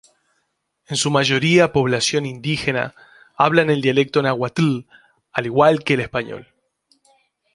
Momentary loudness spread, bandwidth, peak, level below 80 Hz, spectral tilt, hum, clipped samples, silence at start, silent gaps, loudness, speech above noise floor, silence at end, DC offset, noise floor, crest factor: 11 LU; 11.5 kHz; 0 dBFS; -54 dBFS; -4.5 dB/octave; none; under 0.1%; 0.9 s; none; -18 LUFS; 53 dB; 1.15 s; under 0.1%; -71 dBFS; 20 dB